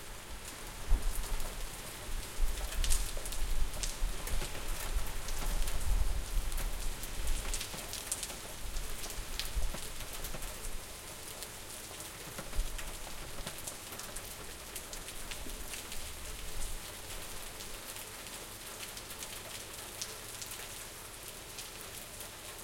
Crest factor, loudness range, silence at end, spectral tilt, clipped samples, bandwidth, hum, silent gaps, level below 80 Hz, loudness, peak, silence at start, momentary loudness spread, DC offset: 22 dB; 4 LU; 0 s; -2.5 dB/octave; under 0.1%; 17 kHz; none; none; -38 dBFS; -41 LUFS; -14 dBFS; 0 s; 6 LU; under 0.1%